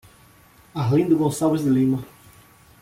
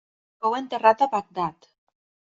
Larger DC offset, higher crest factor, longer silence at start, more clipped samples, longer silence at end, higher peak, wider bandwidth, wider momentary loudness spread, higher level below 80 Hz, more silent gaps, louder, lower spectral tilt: neither; second, 14 dB vs 22 dB; first, 0.75 s vs 0.4 s; neither; about the same, 0.75 s vs 0.8 s; second, -8 dBFS vs -4 dBFS; first, 16 kHz vs 7.8 kHz; about the same, 12 LU vs 11 LU; first, -56 dBFS vs -70 dBFS; neither; first, -21 LUFS vs -24 LUFS; first, -7.5 dB/octave vs -5.5 dB/octave